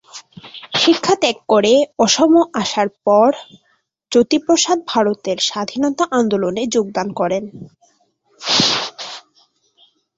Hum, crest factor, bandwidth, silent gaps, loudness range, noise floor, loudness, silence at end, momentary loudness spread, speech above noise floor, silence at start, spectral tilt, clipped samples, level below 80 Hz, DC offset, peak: none; 16 dB; 8 kHz; none; 5 LU; -60 dBFS; -16 LUFS; 1 s; 15 LU; 44 dB; 0.15 s; -3 dB/octave; under 0.1%; -60 dBFS; under 0.1%; -2 dBFS